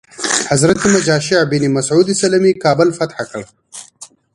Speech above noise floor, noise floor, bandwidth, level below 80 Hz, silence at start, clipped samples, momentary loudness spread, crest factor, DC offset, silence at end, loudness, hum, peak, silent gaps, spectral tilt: 27 dB; -41 dBFS; 11.5 kHz; -50 dBFS; 0.2 s; under 0.1%; 18 LU; 14 dB; under 0.1%; 0.3 s; -13 LUFS; none; 0 dBFS; none; -4.5 dB/octave